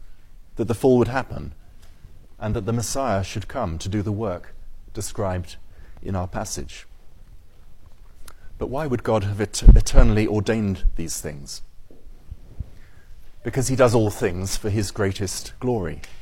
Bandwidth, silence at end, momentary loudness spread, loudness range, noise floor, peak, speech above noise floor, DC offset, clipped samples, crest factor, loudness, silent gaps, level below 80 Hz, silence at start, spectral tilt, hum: 16 kHz; 0 s; 21 LU; 10 LU; -42 dBFS; 0 dBFS; 22 dB; under 0.1%; under 0.1%; 20 dB; -23 LUFS; none; -26 dBFS; 0 s; -5.5 dB/octave; none